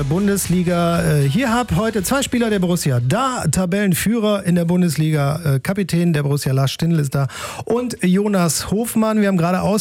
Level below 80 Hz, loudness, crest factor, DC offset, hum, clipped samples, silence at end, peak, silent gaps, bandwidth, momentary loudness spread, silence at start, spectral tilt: -42 dBFS; -18 LUFS; 16 dB; under 0.1%; none; under 0.1%; 0 s; -2 dBFS; none; 17 kHz; 3 LU; 0 s; -5.5 dB/octave